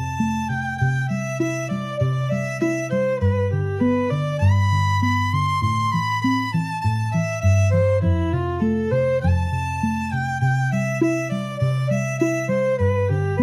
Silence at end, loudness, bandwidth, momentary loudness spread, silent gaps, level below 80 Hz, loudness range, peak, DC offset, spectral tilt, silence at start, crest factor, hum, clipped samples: 0 s; -21 LUFS; 13 kHz; 5 LU; none; -46 dBFS; 2 LU; -8 dBFS; under 0.1%; -7 dB/octave; 0 s; 14 dB; none; under 0.1%